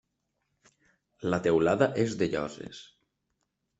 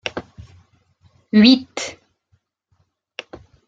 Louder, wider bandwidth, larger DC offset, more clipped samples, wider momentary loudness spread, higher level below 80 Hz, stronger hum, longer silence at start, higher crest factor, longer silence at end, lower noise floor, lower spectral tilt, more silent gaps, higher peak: second, -28 LUFS vs -16 LUFS; about the same, 8.2 kHz vs 8.8 kHz; neither; neither; second, 19 LU vs 24 LU; second, -64 dBFS vs -58 dBFS; neither; first, 1.2 s vs 0.05 s; about the same, 22 dB vs 20 dB; second, 1 s vs 1.75 s; first, -80 dBFS vs -66 dBFS; about the same, -6 dB/octave vs -5 dB/octave; neither; second, -10 dBFS vs -2 dBFS